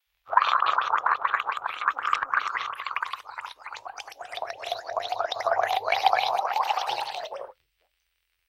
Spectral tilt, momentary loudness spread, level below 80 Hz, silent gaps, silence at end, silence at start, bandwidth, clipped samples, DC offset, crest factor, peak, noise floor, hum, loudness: -0.5 dB/octave; 16 LU; -74 dBFS; none; 1 s; 0.25 s; 16.5 kHz; under 0.1%; under 0.1%; 24 dB; -4 dBFS; -76 dBFS; none; -27 LUFS